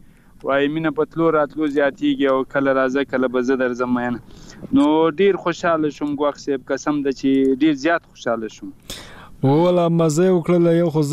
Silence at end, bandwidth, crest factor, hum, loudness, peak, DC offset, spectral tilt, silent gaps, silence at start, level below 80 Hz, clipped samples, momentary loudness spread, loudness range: 0 s; 14 kHz; 12 dB; none; -19 LUFS; -6 dBFS; under 0.1%; -6.5 dB/octave; none; 0.45 s; -50 dBFS; under 0.1%; 10 LU; 2 LU